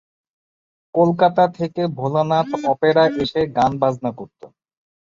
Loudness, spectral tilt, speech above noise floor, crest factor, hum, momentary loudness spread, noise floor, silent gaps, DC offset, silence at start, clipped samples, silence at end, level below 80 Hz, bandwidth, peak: -18 LUFS; -7 dB/octave; over 72 dB; 18 dB; none; 10 LU; under -90 dBFS; none; under 0.1%; 0.95 s; under 0.1%; 0.55 s; -54 dBFS; 7.6 kHz; -2 dBFS